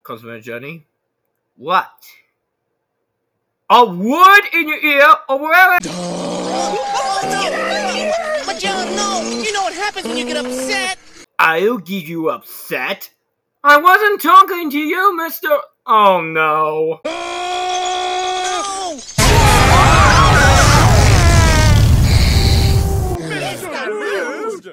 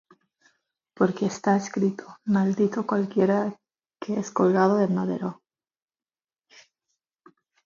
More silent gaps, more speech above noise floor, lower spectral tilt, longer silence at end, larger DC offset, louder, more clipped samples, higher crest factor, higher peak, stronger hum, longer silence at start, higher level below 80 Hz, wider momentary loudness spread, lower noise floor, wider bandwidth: neither; second, 57 dB vs over 67 dB; second, -4.5 dB/octave vs -7 dB/octave; second, 0 s vs 2.3 s; neither; first, -13 LUFS vs -25 LUFS; neither; about the same, 14 dB vs 18 dB; first, 0 dBFS vs -8 dBFS; neither; second, 0.1 s vs 1 s; first, -22 dBFS vs -72 dBFS; first, 14 LU vs 11 LU; second, -72 dBFS vs under -90 dBFS; first, over 20 kHz vs 7.4 kHz